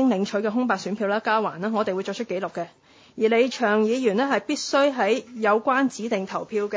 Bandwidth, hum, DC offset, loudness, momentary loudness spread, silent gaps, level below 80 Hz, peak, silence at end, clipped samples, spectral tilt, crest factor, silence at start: 8 kHz; none; under 0.1%; -23 LUFS; 8 LU; none; -72 dBFS; -8 dBFS; 0 s; under 0.1%; -4.5 dB/octave; 16 dB; 0 s